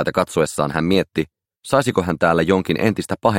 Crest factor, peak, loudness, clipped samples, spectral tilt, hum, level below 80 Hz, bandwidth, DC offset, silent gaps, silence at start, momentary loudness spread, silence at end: 18 dB; -2 dBFS; -19 LUFS; under 0.1%; -5.5 dB/octave; none; -48 dBFS; 16.5 kHz; under 0.1%; none; 0 s; 8 LU; 0 s